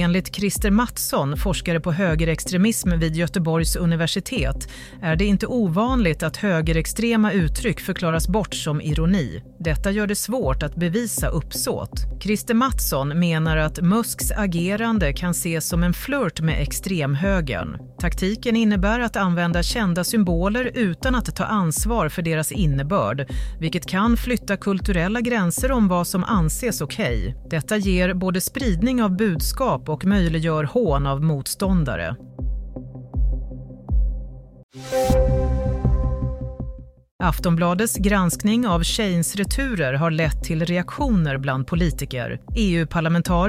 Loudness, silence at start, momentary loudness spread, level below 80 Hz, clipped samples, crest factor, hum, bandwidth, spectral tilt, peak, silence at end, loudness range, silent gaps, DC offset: -22 LUFS; 0 s; 8 LU; -30 dBFS; under 0.1%; 16 dB; none; 16 kHz; -5.5 dB/octave; -6 dBFS; 0 s; 3 LU; 34.63-34.69 s, 37.11-37.19 s; under 0.1%